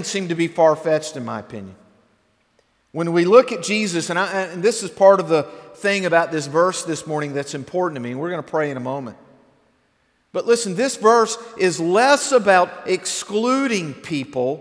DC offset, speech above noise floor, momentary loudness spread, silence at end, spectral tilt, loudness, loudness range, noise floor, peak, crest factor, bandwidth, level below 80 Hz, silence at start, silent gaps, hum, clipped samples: under 0.1%; 45 dB; 13 LU; 0 s; -4 dB/octave; -19 LUFS; 7 LU; -64 dBFS; 0 dBFS; 20 dB; 11 kHz; -70 dBFS; 0 s; none; none; under 0.1%